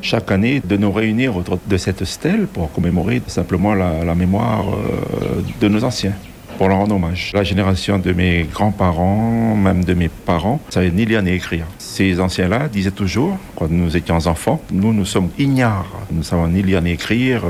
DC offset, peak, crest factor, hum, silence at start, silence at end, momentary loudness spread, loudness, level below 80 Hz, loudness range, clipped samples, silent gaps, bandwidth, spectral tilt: under 0.1%; -4 dBFS; 14 dB; none; 0 s; 0 s; 5 LU; -17 LUFS; -34 dBFS; 2 LU; under 0.1%; none; 15.5 kHz; -6.5 dB/octave